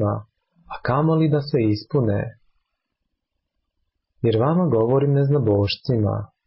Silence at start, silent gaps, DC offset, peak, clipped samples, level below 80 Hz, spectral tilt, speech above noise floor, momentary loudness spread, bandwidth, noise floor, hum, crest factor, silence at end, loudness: 0 s; none; under 0.1%; -8 dBFS; under 0.1%; -48 dBFS; -12 dB/octave; 58 dB; 8 LU; 5.8 kHz; -78 dBFS; none; 12 dB; 0.2 s; -21 LUFS